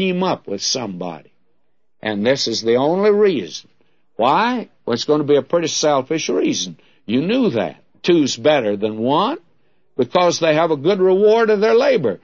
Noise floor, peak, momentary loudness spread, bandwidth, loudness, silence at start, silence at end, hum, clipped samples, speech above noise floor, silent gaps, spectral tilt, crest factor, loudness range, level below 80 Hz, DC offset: -71 dBFS; -2 dBFS; 13 LU; 7.6 kHz; -17 LUFS; 0 s; 0.05 s; none; under 0.1%; 54 dB; none; -4.5 dB/octave; 16 dB; 3 LU; -66 dBFS; 0.2%